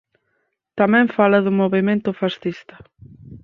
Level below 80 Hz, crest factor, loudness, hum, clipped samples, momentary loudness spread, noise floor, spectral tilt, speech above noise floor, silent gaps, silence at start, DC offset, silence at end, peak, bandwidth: -58 dBFS; 18 dB; -18 LUFS; none; under 0.1%; 13 LU; -71 dBFS; -8.5 dB/octave; 53 dB; none; 0.75 s; under 0.1%; 0.05 s; -2 dBFS; 6 kHz